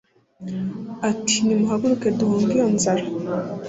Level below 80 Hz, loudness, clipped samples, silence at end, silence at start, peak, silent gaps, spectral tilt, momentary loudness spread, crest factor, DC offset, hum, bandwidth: -58 dBFS; -21 LUFS; under 0.1%; 0 s; 0.4 s; -6 dBFS; none; -4.5 dB/octave; 10 LU; 14 dB; under 0.1%; none; 8 kHz